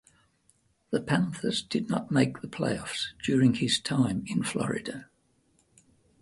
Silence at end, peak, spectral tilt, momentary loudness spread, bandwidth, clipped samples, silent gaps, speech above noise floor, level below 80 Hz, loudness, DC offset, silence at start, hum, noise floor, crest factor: 1.15 s; -10 dBFS; -5 dB/octave; 9 LU; 11.5 kHz; under 0.1%; none; 41 dB; -60 dBFS; -28 LUFS; under 0.1%; 0.9 s; none; -69 dBFS; 20 dB